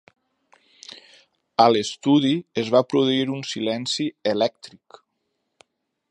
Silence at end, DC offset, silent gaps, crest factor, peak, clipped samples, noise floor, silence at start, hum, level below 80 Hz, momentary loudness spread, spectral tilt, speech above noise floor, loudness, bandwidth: 1.45 s; under 0.1%; none; 22 dB; -2 dBFS; under 0.1%; -76 dBFS; 1.6 s; none; -70 dBFS; 15 LU; -5 dB/octave; 54 dB; -21 LUFS; 10.5 kHz